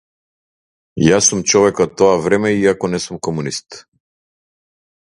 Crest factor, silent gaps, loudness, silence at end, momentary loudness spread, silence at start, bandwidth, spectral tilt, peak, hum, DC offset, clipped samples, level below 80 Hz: 18 dB; none; -15 LUFS; 1.35 s; 11 LU; 0.95 s; 11.5 kHz; -4 dB/octave; 0 dBFS; none; under 0.1%; under 0.1%; -48 dBFS